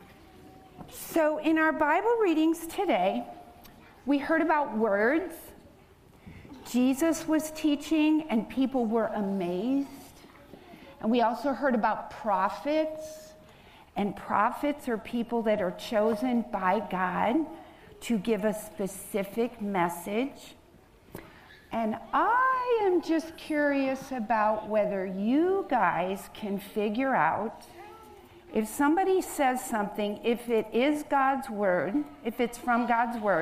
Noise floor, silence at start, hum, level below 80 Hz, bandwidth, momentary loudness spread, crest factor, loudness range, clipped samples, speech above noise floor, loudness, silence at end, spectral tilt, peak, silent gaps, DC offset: -57 dBFS; 0 s; none; -60 dBFS; 15.5 kHz; 11 LU; 18 dB; 4 LU; under 0.1%; 29 dB; -28 LUFS; 0 s; -5 dB/octave; -10 dBFS; none; under 0.1%